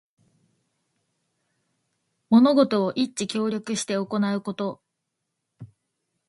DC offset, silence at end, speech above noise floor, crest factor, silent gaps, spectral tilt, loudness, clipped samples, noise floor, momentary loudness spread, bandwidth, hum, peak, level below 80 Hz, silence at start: under 0.1%; 0.6 s; 58 dB; 20 dB; none; -5 dB/octave; -23 LUFS; under 0.1%; -80 dBFS; 11 LU; 11.5 kHz; none; -6 dBFS; -70 dBFS; 2.3 s